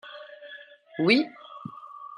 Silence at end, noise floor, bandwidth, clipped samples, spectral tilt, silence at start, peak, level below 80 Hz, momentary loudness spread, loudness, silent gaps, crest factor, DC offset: 0.05 s; -47 dBFS; 10 kHz; under 0.1%; -6 dB/octave; 0.05 s; -8 dBFS; -82 dBFS; 22 LU; -24 LUFS; none; 22 dB; under 0.1%